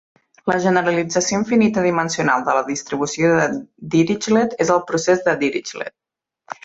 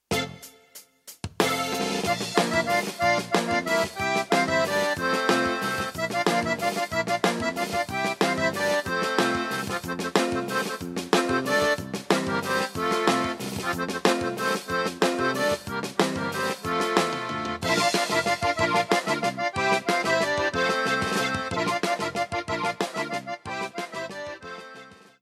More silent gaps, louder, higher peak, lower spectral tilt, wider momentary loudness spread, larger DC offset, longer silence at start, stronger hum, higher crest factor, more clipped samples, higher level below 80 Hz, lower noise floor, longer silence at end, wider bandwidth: neither; first, -18 LUFS vs -25 LUFS; about the same, -2 dBFS vs -4 dBFS; about the same, -4.5 dB/octave vs -3.5 dB/octave; about the same, 10 LU vs 8 LU; neither; first, 0.45 s vs 0.1 s; neither; second, 16 dB vs 22 dB; neither; about the same, -58 dBFS vs -56 dBFS; second, -38 dBFS vs -51 dBFS; second, 0.1 s vs 0.3 s; second, 8 kHz vs 16 kHz